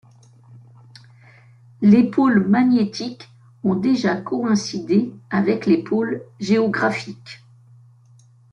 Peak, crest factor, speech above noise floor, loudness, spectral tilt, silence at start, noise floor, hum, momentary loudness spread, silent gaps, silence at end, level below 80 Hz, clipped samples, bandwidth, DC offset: -4 dBFS; 16 dB; 32 dB; -19 LUFS; -6.5 dB/octave; 0.5 s; -51 dBFS; none; 14 LU; none; 1.15 s; -62 dBFS; under 0.1%; 8.4 kHz; under 0.1%